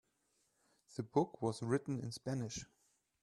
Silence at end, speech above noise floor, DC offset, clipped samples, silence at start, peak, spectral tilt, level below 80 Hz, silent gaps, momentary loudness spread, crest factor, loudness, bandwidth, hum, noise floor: 0.6 s; 41 dB; under 0.1%; under 0.1%; 0.9 s; -20 dBFS; -6 dB/octave; -72 dBFS; none; 11 LU; 20 dB; -40 LUFS; 12.5 kHz; none; -80 dBFS